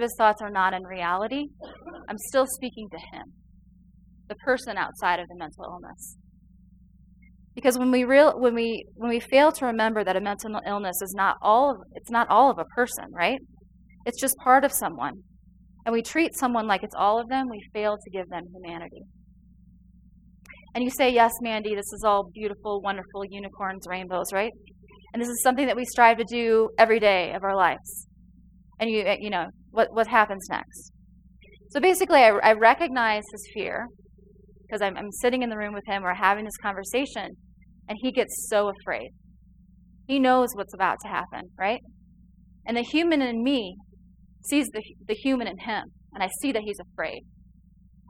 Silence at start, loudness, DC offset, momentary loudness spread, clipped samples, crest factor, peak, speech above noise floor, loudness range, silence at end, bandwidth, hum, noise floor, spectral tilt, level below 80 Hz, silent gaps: 0 s; -24 LUFS; under 0.1%; 19 LU; under 0.1%; 24 dB; -2 dBFS; 31 dB; 9 LU; 0.9 s; 16.5 kHz; none; -55 dBFS; -3.5 dB/octave; -56 dBFS; none